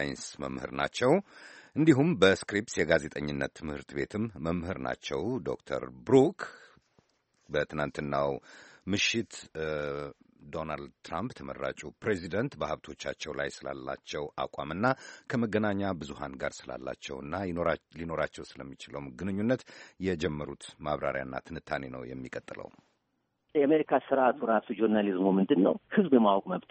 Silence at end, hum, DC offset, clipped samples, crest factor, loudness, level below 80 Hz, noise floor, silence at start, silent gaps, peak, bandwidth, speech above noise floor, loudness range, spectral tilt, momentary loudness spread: 0.1 s; none; under 0.1%; under 0.1%; 22 dB; -31 LUFS; -58 dBFS; -79 dBFS; 0 s; none; -8 dBFS; 8.4 kHz; 48 dB; 8 LU; -5.5 dB/octave; 16 LU